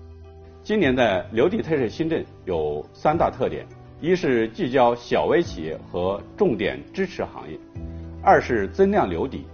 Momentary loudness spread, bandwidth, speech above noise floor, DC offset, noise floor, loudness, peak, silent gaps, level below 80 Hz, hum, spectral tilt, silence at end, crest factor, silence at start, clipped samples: 14 LU; 6.8 kHz; 21 dB; under 0.1%; -43 dBFS; -23 LUFS; -4 dBFS; none; -44 dBFS; none; -5 dB/octave; 0 s; 20 dB; 0 s; under 0.1%